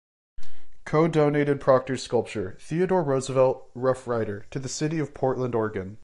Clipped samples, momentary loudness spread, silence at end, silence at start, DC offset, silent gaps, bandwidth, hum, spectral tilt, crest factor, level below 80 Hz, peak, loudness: under 0.1%; 10 LU; 0 s; 0.35 s; under 0.1%; none; 11.5 kHz; none; -6.5 dB/octave; 18 dB; -54 dBFS; -6 dBFS; -25 LUFS